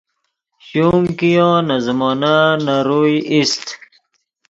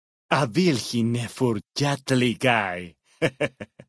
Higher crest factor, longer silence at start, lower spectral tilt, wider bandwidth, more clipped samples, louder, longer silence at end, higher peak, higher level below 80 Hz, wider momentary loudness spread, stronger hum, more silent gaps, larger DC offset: about the same, 16 dB vs 20 dB; first, 0.65 s vs 0.3 s; about the same, -5.5 dB/octave vs -5.5 dB/octave; second, 8 kHz vs 11 kHz; neither; first, -15 LUFS vs -24 LUFS; first, 0.75 s vs 0.25 s; first, 0 dBFS vs -4 dBFS; first, -50 dBFS vs -60 dBFS; about the same, 8 LU vs 9 LU; neither; neither; neither